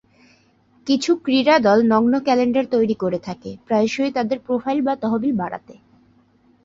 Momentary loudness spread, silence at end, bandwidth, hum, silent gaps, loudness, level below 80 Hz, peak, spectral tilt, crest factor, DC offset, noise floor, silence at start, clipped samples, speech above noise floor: 13 LU; 0.9 s; 7.8 kHz; none; none; -19 LUFS; -60 dBFS; -4 dBFS; -5.5 dB/octave; 16 dB; under 0.1%; -57 dBFS; 0.85 s; under 0.1%; 38 dB